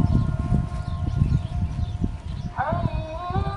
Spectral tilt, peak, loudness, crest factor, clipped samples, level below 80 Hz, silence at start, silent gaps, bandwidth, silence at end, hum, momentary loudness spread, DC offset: -8.5 dB/octave; -6 dBFS; -26 LUFS; 18 dB; under 0.1%; -30 dBFS; 0 s; none; 10.5 kHz; 0 s; none; 7 LU; under 0.1%